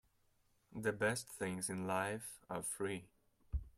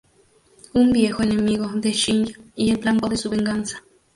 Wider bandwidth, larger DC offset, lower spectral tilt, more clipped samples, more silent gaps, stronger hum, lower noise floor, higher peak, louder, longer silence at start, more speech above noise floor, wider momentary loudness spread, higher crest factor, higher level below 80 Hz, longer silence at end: first, 16 kHz vs 11.5 kHz; neither; about the same, -4 dB/octave vs -4.5 dB/octave; neither; neither; neither; first, -76 dBFS vs -58 dBFS; second, -24 dBFS vs -6 dBFS; second, -41 LUFS vs -21 LUFS; about the same, 0.7 s vs 0.75 s; about the same, 35 dB vs 37 dB; about the same, 10 LU vs 9 LU; about the same, 18 dB vs 16 dB; second, -56 dBFS vs -48 dBFS; second, 0.05 s vs 0.35 s